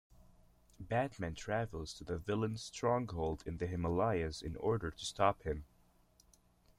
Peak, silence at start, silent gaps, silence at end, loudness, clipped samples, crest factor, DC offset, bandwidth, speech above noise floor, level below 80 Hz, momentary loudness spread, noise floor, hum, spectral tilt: -16 dBFS; 0.8 s; none; 1.15 s; -38 LUFS; under 0.1%; 22 dB; under 0.1%; 14 kHz; 32 dB; -56 dBFS; 9 LU; -69 dBFS; none; -6 dB/octave